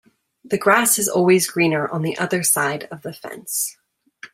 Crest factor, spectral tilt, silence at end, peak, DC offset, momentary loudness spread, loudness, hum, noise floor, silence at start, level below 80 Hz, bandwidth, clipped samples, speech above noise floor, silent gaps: 20 dB; -3.5 dB/octave; 0.1 s; 0 dBFS; under 0.1%; 16 LU; -18 LUFS; none; -45 dBFS; 0.45 s; -64 dBFS; 16 kHz; under 0.1%; 25 dB; none